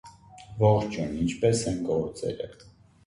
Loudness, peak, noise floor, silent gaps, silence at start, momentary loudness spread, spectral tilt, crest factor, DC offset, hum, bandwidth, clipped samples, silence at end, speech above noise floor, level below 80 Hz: -27 LUFS; -8 dBFS; -48 dBFS; none; 0.05 s; 14 LU; -6.5 dB/octave; 20 dB; under 0.1%; none; 11.5 kHz; under 0.1%; 0.55 s; 22 dB; -50 dBFS